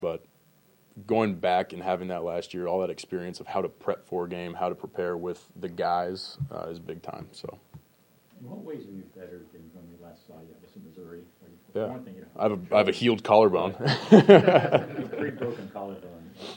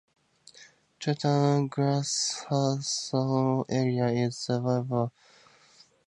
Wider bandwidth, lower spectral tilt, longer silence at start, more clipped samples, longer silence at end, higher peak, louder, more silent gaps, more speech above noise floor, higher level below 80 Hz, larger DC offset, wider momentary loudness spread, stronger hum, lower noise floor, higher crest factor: first, 16.5 kHz vs 11 kHz; first, -7 dB/octave vs -5.5 dB/octave; second, 0 s vs 0.6 s; neither; second, 0 s vs 1 s; first, 0 dBFS vs -12 dBFS; first, -25 LUFS vs -28 LUFS; neither; first, 37 dB vs 32 dB; about the same, -66 dBFS vs -70 dBFS; neither; first, 23 LU vs 5 LU; neither; about the same, -62 dBFS vs -59 dBFS; first, 26 dB vs 18 dB